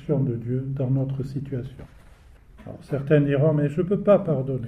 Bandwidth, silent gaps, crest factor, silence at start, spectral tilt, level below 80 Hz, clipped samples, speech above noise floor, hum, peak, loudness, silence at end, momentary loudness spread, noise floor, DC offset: 4.9 kHz; none; 18 dB; 0 s; -10 dB/octave; -50 dBFS; under 0.1%; 26 dB; none; -6 dBFS; -23 LUFS; 0 s; 13 LU; -49 dBFS; under 0.1%